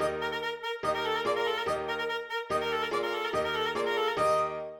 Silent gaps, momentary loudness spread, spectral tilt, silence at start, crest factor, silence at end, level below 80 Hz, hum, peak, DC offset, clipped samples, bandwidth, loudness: none; 5 LU; -3.5 dB/octave; 0 s; 14 dB; 0 s; -60 dBFS; none; -16 dBFS; under 0.1%; under 0.1%; 17.5 kHz; -30 LUFS